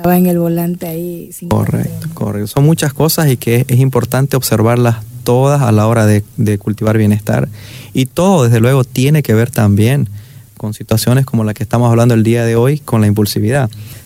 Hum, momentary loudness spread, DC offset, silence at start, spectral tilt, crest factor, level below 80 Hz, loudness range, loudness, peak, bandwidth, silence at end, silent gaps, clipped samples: none; 10 LU; under 0.1%; 0 s; -6.5 dB/octave; 10 dB; -42 dBFS; 2 LU; -12 LUFS; -2 dBFS; 16.5 kHz; 0.05 s; none; under 0.1%